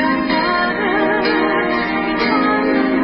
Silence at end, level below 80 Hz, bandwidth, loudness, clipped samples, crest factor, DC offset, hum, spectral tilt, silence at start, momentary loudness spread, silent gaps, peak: 0 s; -44 dBFS; 5.8 kHz; -16 LUFS; under 0.1%; 12 dB; under 0.1%; none; -10 dB/octave; 0 s; 2 LU; none; -4 dBFS